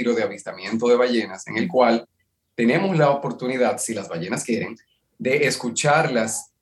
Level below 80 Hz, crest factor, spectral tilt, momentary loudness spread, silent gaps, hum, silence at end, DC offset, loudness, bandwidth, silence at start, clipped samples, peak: -74 dBFS; 18 dB; -4.5 dB/octave; 9 LU; none; none; 0.2 s; under 0.1%; -21 LUFS; 12.5 kHz; 0 s; under 0.1%; -4 dBFS